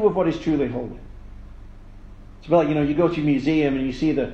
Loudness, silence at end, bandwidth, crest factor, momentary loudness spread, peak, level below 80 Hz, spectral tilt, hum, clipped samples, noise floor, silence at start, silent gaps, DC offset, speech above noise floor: -21 LUFS; 0 s; 7.8 kHz; 18 dB; 9 LU; -4 dBFS; -40 dBFS; -8 dB/octave; none; under 0.1%; -41 dBFS; 0 s; none; under 0.1%; 20 dB